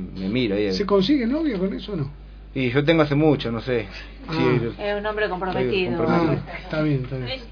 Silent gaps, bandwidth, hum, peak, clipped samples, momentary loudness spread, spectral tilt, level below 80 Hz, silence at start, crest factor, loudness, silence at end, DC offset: none; 5.4 kHz; 50 Hz at -40 dBFS; -4 dBFS; under 0.1%; 11 LU; -7.5 dB/octave; -40 dBFS; 0 s; 18 dB; -22 LUFS; 0 s; under 0.1%